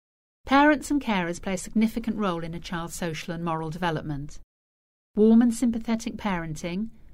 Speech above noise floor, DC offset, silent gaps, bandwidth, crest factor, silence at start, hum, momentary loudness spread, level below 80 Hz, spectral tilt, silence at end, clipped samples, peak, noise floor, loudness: over 64 dB; under 0.1%; 4.44-5.14 s; 15.5 kHz; 16 dB; 0.45 s; none; 14 LU; -46 dBFS; -5.5 dB/octave; 0 s; under 0.1%; -10 dBFS; under -90 dBFS; -26 LUFS